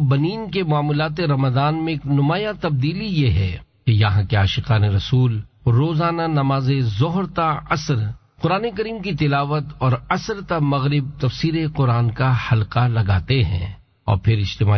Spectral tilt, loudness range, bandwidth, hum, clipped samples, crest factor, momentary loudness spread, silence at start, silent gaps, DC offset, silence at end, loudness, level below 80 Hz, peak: -7.5 dB/octave; 2 LU; 6.4 kHz; none; under 0.1%; 14 dB; 5 LU; 0 s; none; under 0.1%; 0 s; -20 LUFS; -36 dBFS; -6 dBFS